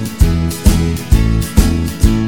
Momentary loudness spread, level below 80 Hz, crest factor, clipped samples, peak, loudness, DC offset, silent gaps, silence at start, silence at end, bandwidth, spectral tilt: 2 LU; -14 dBFS; 12 dB; 1%; 0 dBFS; -14 LUFS; 2%; none; 0 s; 0 s; 18.5 kHz; -6 dB/octave